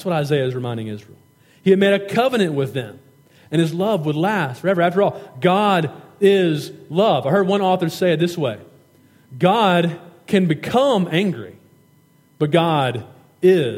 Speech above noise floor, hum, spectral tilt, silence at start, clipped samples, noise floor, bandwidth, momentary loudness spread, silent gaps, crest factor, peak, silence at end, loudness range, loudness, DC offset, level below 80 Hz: 37 dB; none; -6.5 dB/octave; 0 s; under 0.1%; -55 dBFS; 16 kHz; 11 LU; none; 16 dB; -2 dBFS; 0 s; 2 LU; -19 LUFS; under 0.1%; -66 dBFS